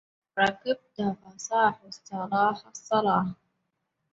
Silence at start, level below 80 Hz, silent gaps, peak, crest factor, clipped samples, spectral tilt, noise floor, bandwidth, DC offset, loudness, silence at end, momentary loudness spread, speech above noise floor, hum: 0.35 s; -68 dBFS; none; -8 dBFS; 22 dB; under 0.1%; -4.5 dB/octave; -79 dBFS; 8 kHz; under 0.1%; -27 LUFS; 0.8 s; 13 LU; 52 dB; none